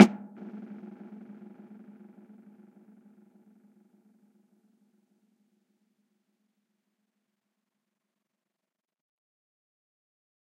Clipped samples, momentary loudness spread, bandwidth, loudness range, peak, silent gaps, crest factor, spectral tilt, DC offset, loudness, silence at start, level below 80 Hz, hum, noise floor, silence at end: under 0.1%; 12 LU; 15 kHz; 15 LU; 0 dBFS; none; 34 dB; -6.5 dB/octave; under 0.1%; -30 LUFS; 0 s; -78 dBFS; none; -89 dBFS; 10.35 s